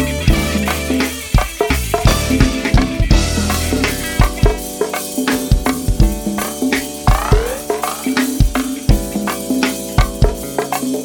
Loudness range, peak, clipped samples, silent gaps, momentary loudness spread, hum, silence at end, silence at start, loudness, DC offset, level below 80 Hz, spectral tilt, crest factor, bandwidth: 2 LU; 0 dBFS; under 0.1%; none; 5 LU; none; 0 s; 0 s; -17 LUFS; under 0.1%; -20 dBFS; -5 dB/octave; 14 dB; 19.5 kHz